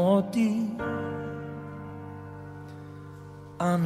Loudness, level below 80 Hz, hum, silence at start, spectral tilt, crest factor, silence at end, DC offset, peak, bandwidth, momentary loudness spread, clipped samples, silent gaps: -30 LUFS; -60 dBFS; none; 0 s; -7.5 dB/octave; 18 dB; 0 s; under 0.1%; -10 dBFS; 14 kHz; 19 LU; under 0.1%; none